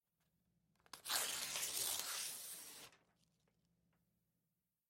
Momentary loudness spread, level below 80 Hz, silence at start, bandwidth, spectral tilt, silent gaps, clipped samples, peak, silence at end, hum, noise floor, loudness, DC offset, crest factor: 18 LU; -86 dBFS; 0.95 s; 16.5 kHz; 1.5 dB/octave; none; under 0.1%; -20 dBFS; 1.95 s; none; -90 dBFS; -42 LUFS; under 0.1%; 28 dB